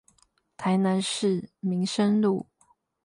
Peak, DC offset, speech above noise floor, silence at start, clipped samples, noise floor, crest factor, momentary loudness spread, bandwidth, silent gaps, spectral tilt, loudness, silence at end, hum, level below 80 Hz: -12 dBFS; under 0.1%; 41 dB; 0.6 s; under 0.1%; -66 dBFS; 14 dB; 9 LU; 11.5 kHz; none; -5.5 dB/octave; -26 LUFS; 0.65 s; none; -70 dBFS